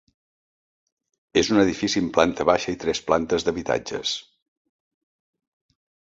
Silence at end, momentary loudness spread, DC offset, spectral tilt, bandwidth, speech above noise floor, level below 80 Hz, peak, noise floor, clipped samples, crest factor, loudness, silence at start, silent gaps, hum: 1.9 s; 7 LU; under 0.1%; -4 dB/octave; 8 kHz; over 68 dB; -52 dBFS; -2 dBFS; under -90 dBFS; under 0.1%; 24 dB; -23 LUFS; 1.35 s; none; none